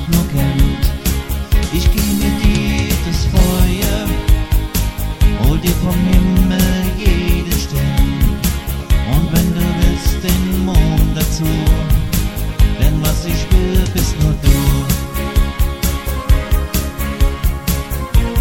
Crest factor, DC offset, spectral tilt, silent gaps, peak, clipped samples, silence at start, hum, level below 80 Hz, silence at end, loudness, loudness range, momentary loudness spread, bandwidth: 12 dB; under 0.1%; -5.5 dB/octave; none; 0 dBFS; under 0.1%; 0 s; none; -16 dBFS; 0 s; -16 LUFS; 1 LU; 5 LU; 17 kHz